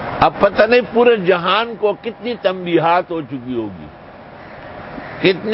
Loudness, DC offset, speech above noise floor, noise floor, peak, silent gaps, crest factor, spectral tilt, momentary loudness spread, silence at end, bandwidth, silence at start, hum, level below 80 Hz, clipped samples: -16 LUFS; under 0.1%; 22 dB; -37 dBFS; 0 dBFS; none; 16 dB; -8.5 dB/octave; 21 LU; 0 s; 5.8 kHz; 0 s; none; -46 dBFS; under 0.1%